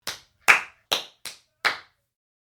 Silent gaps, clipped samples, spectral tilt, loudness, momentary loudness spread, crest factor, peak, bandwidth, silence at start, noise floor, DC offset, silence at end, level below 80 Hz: none; under 0.1%; 0.5 dB/octave; -23 LUFS; 20 LU; 28 dB; 0 dBFS; over 20 kHz; 0.05 s; -44 dBFS; under 0.1%; 0.65 s; -70 dBFS